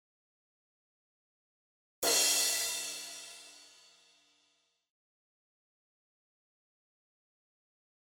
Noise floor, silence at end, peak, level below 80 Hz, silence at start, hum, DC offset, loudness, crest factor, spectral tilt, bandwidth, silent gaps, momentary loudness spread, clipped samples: -76 dBFS; 4.4 s; -16 dBFS; -82 dBFS; 2 s; none; under 0.1%; -29 LUFS; 24 dB; 2 dB/octave; over 20 kHz; none; 21 LU; under 0.1%